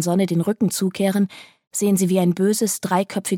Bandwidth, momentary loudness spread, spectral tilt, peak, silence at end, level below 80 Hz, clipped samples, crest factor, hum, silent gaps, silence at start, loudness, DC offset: 17 kHz; 5 LU; -5.5 dB/octave; -6 dBFS; 0 s; -68 dBFS; under 0.1%; 14 dB; none; 1.67-1.71 s; 0 s; -20 LUFS; under 0.1%